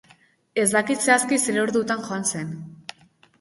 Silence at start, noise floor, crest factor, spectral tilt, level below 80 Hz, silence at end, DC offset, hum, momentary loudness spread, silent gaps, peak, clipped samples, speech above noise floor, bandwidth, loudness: 0.55 s; -57 dBFS; 20 dB; -3 dB/octave; -66 dBFS; 0.65 s; under 0.1%; none; 19 LU; none; -4 dBFS; under 0.1%; 35 dB; 12 kHz; -22 LUFS